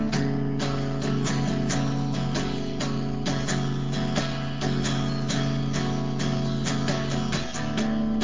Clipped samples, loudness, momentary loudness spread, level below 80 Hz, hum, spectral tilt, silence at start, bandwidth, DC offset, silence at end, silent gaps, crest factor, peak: under 0.1%; -27 LUFS; 3 LU; -44 dBFS; none; -5.5 dB/octave; 0 s; 7.6 kHz; 2%; 0 s; none; 16 dB; -10 dBFS